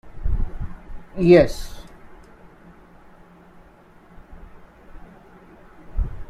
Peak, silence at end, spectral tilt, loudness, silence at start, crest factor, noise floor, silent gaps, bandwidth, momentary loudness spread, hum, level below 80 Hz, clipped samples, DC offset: -2 dBFS; 0.05 s; -7.5 dB/octave; -19 LUFS; 0.05 s; 22 dB; -50 dBFS; none; 13 kHz; 26 LU; none; -32 dBFS; under 0.1%; under 0.1%